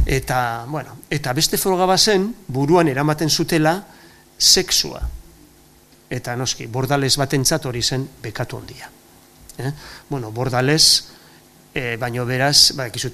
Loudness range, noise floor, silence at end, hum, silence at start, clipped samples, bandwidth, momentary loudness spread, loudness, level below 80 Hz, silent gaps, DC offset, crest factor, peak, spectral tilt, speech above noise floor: 5 LU; -50 dBFS; 0 s; none; 0 s; under 0.1%; 15.5 kHz; 17 LU; -17 LUFS; -38 dBFS; none; under 0.1%; 20 dB; 0 dBFS; -3 dB/octave; 31 dB